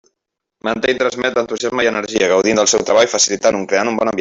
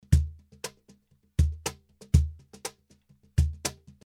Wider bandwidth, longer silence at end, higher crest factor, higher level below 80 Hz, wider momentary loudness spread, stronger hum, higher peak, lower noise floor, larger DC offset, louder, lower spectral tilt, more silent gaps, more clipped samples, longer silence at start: second, 8.2 kHz vs 15.5 kHz; second, 0 s vs 0.35 s; second, 14 dB vs 24 dB; second, -54 dBFS vs -32 dBFS; second, 6 LU vs 15 LU; neither; first, -2 dBFS vs -6 dBFS; first, -78 dBFS vs -62 dBFS; neither; first, -15 LUFS vs -30 LUFS; second, -2 dB/octave vs -5.5 dB/octave; neither; neither; first, 0.65 s vs 0.1 s